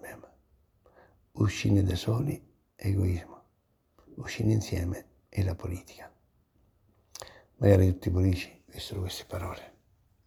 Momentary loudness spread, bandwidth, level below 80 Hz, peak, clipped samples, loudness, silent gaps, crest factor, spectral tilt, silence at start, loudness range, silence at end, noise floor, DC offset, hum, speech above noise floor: 23 LU; 14.5 kHz; -50 dBFS; -8 dBFS; under 0.1%; -30 LUFS; none; 24 dB; -7 dB/octave; 0.05 s; 5 LU; 0.6 s; -72 dBFS; under 0.1%; none; 44 dB